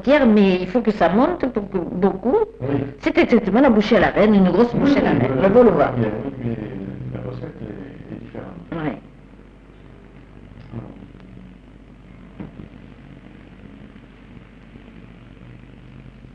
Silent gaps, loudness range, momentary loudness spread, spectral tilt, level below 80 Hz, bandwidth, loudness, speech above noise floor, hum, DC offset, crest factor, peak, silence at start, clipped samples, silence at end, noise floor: none; 24 LU; 21 LU; -8.5 dB/octave; -44 dBFS; 7 kHz; -18 LUFS; 28 dB; none; under 0.1%; 16 dB; -4 dBFS; 0 s; under 0.1%; 0.3 s; -44 dBFS